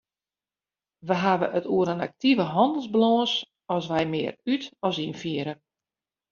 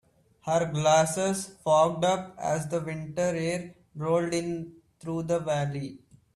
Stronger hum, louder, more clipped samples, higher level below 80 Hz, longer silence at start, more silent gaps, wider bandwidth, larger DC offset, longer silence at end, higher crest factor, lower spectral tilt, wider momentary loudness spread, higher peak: neither; first, -25 LUFS vs -28 LUFS; neither; second, -68 dBFS vs -62 dBFS; first, 1.05 s vs 0.45 s; neither; second, 7.2 kHz vs 14 kHz; neither; first, 0.75 s vs 0.4 s; about the same, 20 dB vs 18 dB; about the same, -4 dB/octave vs -5 dB/octave; second, 9 LU vs 14 LU; about the same, -8 dBFS vs -10 dBFS